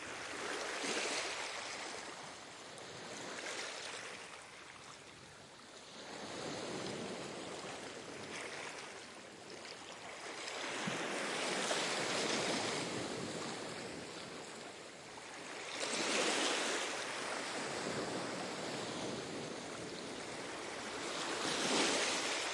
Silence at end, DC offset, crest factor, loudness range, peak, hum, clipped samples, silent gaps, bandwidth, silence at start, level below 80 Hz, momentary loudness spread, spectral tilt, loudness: 0 s; under 0.1%; 20 dB; 9 LU; -22 dBFS; none; under 0.1%; none; 11.5 kHz; 0 s; -78 dBFS; 15 LU; -2 dB/octave; -40 LUFS